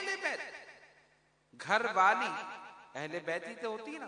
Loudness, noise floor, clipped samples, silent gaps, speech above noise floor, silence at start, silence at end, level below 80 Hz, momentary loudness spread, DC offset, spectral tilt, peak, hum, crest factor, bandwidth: -33 LUFS; -70 dBFS; under 0.1%; none; 37 dB; 0 s; 0 s; -84 dBFS; 20 LU; under 0.1%; -3 dB/octave; -14 dBFS; none; 22 dB; 10.5 kHz